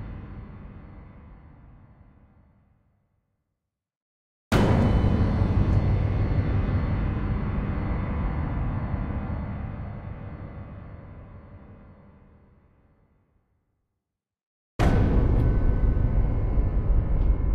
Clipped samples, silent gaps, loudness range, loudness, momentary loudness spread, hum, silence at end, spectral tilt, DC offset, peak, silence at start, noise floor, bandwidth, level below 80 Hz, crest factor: under 0.1%; 3.97-4.51 s, 14.46-14.79 s; 18 LU; -26 LUFS; 22 LU; none; 0 s; -8.5 dB/octave; under 0.1%; -10 dBFS; 0 s; -85 dBFS; 9.2 kHz; -28 dBFS; 16 dB